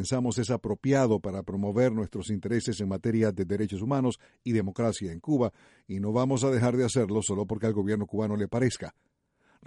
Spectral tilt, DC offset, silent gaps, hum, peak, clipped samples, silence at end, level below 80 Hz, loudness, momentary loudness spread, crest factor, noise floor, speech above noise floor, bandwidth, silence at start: -6.5 dB/octave; under 0.1%; none; none; -12 dBFS; under 0.1%; 0.75 s; -58 dBFS; -28 LUFS; 8 LU; 16 dB; -68 dBFS; 40 dB; 11.5 kHz; 0 s